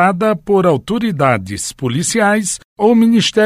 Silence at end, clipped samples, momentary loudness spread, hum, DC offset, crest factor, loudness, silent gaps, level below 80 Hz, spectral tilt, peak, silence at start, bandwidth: 0 s; under 0.1%; 8 LU; none; under 0.1%; 12 dB; -14 LUFS; 2.65-2.76 s; -48 dBFS; -4.5 dB/octave; 0 dBFS; 0 s; 15 kHz